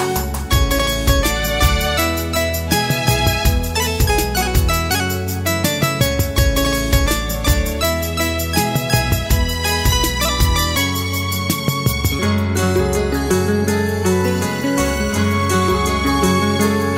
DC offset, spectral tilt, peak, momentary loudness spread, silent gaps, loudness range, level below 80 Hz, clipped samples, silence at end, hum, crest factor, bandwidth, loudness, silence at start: under 0.1%; -4.5 dB/octave; -2 dBFS; 3 LU; none; 1 LU; -24 dBFS; under 0.1%; 0 s; none; 14 dB; 16.5 kHz; -17 LUFS; 0 s